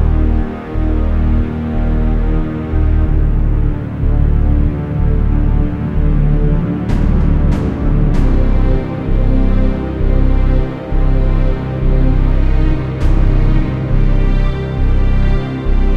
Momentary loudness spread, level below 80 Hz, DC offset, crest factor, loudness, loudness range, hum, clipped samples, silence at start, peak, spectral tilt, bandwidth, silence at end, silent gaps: 4 LU; -12 dBFS; under 0.1%; 12 dB; -16 LUFS; 1 LU; none; under 0.1%; 0 s; 0 dBFS; -9.5 dB/octave; 4.4 kHz; 0 s; none